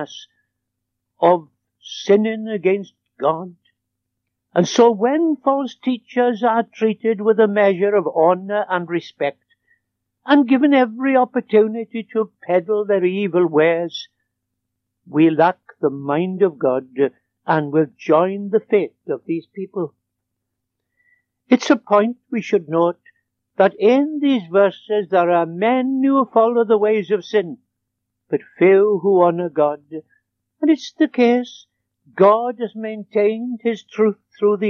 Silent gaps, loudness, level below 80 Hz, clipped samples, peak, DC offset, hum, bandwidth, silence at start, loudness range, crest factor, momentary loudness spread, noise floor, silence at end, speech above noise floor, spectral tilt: none; -18 LUFS; -82 dBFS; under 0.1%; -2 dBFS; under 0.1%; none; 7 kHz; 0 s; 4 LU; 16 dB; 12 LU; -78 dBFS; 0 s; 61 dB; -6.5 dB/octave